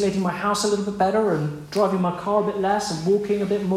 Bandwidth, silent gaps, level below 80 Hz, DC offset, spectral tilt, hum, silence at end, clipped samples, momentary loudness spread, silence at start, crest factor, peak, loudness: 14.5 kHz; none; -54 dBFS; under 0.1%; -5.5 dB/octave; none; 0 s; under 0.1%; 3 LU; 0 s; 16 dB; -6 dBFS; -22 LUFS